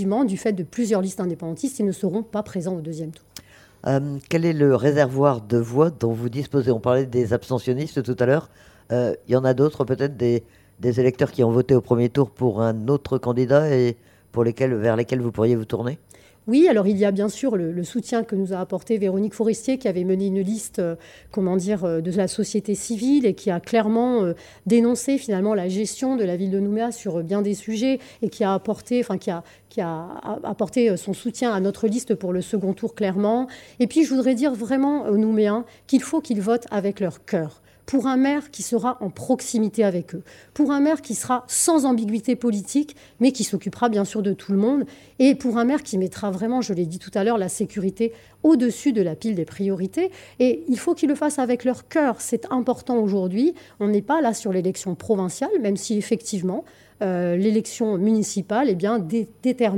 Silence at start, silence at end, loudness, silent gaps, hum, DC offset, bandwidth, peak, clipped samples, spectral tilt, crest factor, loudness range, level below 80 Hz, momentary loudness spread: 0 s; 0 s; -22 LUFS; none; none; under 0.1%; 16.5 kHz; -2 dBFS; under 0.1%; -6 dB/octave; 18 dB; 3 LU; -60 dBFS; 8 LU